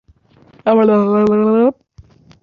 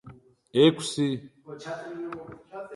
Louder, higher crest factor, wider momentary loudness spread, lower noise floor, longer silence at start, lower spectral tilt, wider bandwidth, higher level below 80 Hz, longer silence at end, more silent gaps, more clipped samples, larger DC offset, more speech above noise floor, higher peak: first, -13 LUFS vs -26 LUFS; second, 14 dB vs 22 dB; second, 5 LU vs 21 LU; about the same, -49 dBFS vs -51 dBFS; first, 0.65 s vs 0.05 s; first, -9.5 dB/octave vs -5.5 dB/octave; second, 4.9 kHz vs 11.5 kHz; first, -54 dBFS vs -66 dBFS; first, 0.7 s vs 0 s; neither; neither; neither; first, 38 dB vs 25 dB; first, -2 dBFS vs -6 dBFS